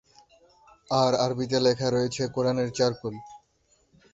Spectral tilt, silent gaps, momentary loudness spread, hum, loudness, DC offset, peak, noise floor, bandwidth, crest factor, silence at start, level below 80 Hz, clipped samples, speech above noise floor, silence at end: -5 dB/octave; none; 9 LU; none; -26 LUFS; under 0.1%; -8 dBFS; -67 dBFS; 8 kHz; 20 dB; 0.9 s; -60 dBFS; under 0.1%; 42 dB; 0.75 s